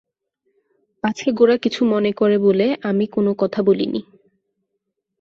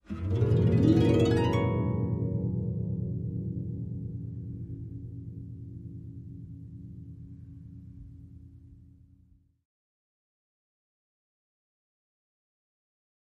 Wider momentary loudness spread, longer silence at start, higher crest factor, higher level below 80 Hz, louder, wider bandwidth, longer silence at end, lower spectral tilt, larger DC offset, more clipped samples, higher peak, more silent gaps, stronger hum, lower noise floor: second, 8 LU vs 24 LU; first, 1.05 s vs 0.1 s; about the same, 18 dB vs 22 dB; second, -62 dBFS vs -50 dBFS; first, -18 LUFS vs -29 LUFS; second, 7.4 kHz vs 8.8 kHz; second, 1.2 s vs 4.55 s; second, -6.5 dB/octave vs -9 dB/octave; neither; neither; first, -2 dBFS vs -10 dBFS; neither; neither; first, -76 dBFS vs -62 dBFS